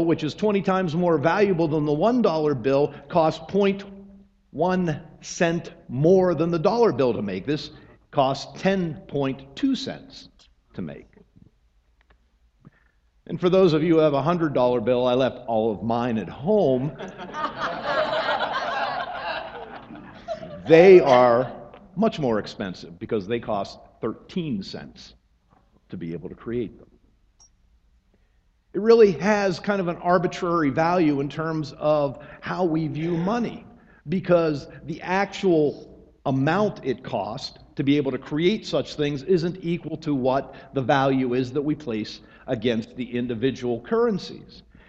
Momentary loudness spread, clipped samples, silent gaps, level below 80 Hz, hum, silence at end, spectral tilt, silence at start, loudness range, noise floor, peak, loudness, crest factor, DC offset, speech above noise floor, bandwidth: 16 LU; under 0.1%; none; -54 dBFS; none; 0.3 s; -7 dB/octave; 0 s; 12 LU; -63 dBFS; 0 dBFS; -23 LUFS; 22 dB; under 0.1%; 40 dB; 7.8 kHz